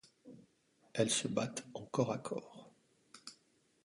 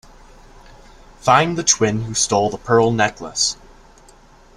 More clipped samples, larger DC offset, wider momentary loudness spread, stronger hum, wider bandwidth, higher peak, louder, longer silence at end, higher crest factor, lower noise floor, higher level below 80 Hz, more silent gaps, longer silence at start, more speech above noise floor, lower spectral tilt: neither; neither; first, 25 LU vs 5 LU; neither; second, 11.5 kHz vs 13 kHz; second, -18 dBFS vs 0 dBFS; second, -38 LUFS vs -17 LUFS; second, 0.5 s vs 1.05 s; about the same, 24 dB vs 20 dB; first, -74 dBFS vs -47 dBFS; second, -78 dBFS vs -46 dBFS; neither; second, 0.25 s vs 1.25 s; first, 37 dB vs 30 dB; about the same, -4 dB/octave vs -3 dB/octave